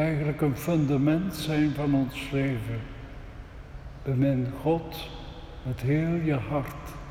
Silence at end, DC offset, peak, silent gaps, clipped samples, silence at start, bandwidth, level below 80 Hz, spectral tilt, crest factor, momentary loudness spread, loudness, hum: 0 s; under 0.1%; -14 dBFS; none; under 0.1%; 0 s; 17 kHz; -44 dBFS; -7.5 dB/octave; 14 dB; 18 LU; -28 LUFS; none